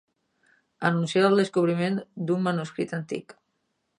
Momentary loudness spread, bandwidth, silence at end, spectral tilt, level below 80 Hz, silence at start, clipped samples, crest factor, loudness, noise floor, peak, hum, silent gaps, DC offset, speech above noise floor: 11 LU; 11 kHz; 0.65 s; -6.5 dB/octave; -76 dBFS; 0.8 s; under 0.1%; 20 dB; -26 LUFS; -76 dBFS; -8 dBFS; none; none; under 0.1%; 51 dB